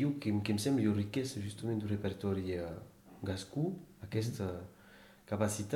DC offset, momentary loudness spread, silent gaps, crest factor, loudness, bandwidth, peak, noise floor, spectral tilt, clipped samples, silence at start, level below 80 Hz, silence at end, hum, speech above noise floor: under 0.1%; 13 LU; none; 18 dB; -37 LUFS; 17.5 kHz; -18 dBFS; -59 dBFS; -6 dB/octave; under 0.1%; 0 s; -64 dBFS; 0 s; none; 23 dB